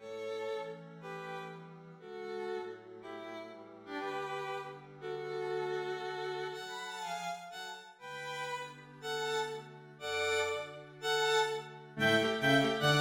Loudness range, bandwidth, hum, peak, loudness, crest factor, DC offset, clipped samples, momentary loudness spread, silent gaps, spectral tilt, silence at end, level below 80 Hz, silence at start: 10 LU; 20 kHz; none; -16 dBFS; -36 LUFS; 20 dB; under 0.1%; under 0.1%; 18 LU; none; -4 dB/octave; 0 s; -76 dBFS; 0 s